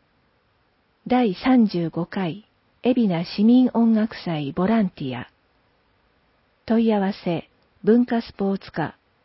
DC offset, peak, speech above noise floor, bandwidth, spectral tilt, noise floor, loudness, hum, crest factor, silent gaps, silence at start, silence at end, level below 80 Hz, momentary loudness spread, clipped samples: under 0.1%; -8 dBFS; 44 dB; 5.8 kHz; -11.5 dB/octave; -65 dBFS; -22 LUFS; none; 16 dB; none; 1.05 s; 0.35 s; -58 dBFS; 12 LU; under 0.1%